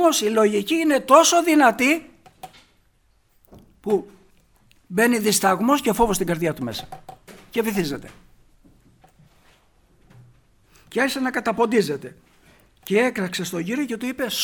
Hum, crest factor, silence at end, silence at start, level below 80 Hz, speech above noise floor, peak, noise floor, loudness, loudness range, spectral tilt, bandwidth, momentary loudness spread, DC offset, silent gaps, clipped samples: none; 22 dB; 0 s; 0 s; -50 dBFS; 41 dB; 0 dBFS; -61 dBFS; -20 LUFS; 12 LU; -3.5 dB/octave; over 20 kHz; 14 LU; under 0.1%; none; under 0.1%